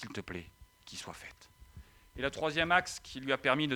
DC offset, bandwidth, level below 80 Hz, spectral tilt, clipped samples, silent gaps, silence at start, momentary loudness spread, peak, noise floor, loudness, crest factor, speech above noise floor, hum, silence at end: under 0.1%; over 20 kHz; -58 dBFS; -4 dB/octave; under 0.1%; none; 0 s; 19 LU; -12 dBFS; -56 dBFS; -33 LUFS; 24 dB; 21 dB; none; 0 s